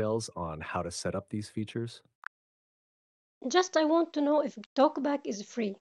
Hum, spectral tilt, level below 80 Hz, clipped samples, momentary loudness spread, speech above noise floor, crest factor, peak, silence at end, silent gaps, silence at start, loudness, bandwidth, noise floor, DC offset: none; -5 dB/octave; -68 dBFS; under 0.1%; 15 LU; over 60 dB; 22 dB; -10 dBFS; 0.1 s; 2.15-3.41 s, 4.66-4.76 s; 0 s; -31 LUFS; 12 kHz; under -90 dBFS; under 0.1%